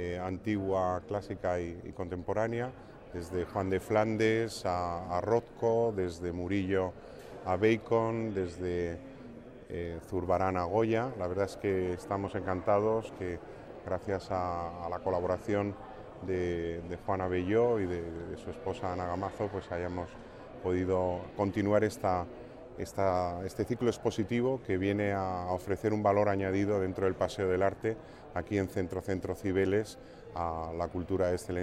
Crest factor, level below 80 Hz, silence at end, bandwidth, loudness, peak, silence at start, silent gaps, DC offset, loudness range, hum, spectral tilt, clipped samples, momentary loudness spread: 18 dB; -56 dBFS; 0 s; 14.5 kHz; -33 LUFS; -14 dBFS; 0 s; none; under 0.1%; 4 LU; none; -7 dB/octave; under 0.1%; 12 LU